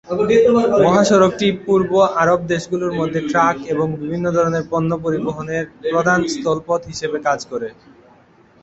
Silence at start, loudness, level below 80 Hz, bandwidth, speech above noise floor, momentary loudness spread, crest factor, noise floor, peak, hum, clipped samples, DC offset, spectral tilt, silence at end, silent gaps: 0.05 s; -17 LUFS; -50 dBFS; 8.2 kHz; 33 dB; 9 LU; 16 dB; -50 dBFS; -2 dBFS; none; under 0.1%; under 0.1%; -5.5 dB/octave; 0.9 s; none